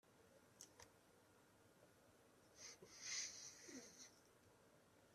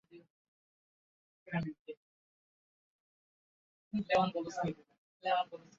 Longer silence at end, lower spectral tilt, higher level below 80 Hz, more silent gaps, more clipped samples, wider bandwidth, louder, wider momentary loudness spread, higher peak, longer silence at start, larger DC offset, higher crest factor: second, 0 s vs 0.2 s; second, -0.5 dB/octave vs -4.5 dB/octave; second, under -90 dBFS vs -72 dBFS; second, none vs 0.30-1.46 s, 1.79-1.85 s, 1.97-3.91 s, 4.98-5.20 s; neither; first, 14 kHz vs 7.4 kHz; second, -54 LUFS vs -36 LUFS; second, 16 LU vs 20 LU; second, -36 dBFS vs -18 dBFS; about the same, 0.05 s vs 0.15 s; neither; about the same, 26 dB vs 22 dB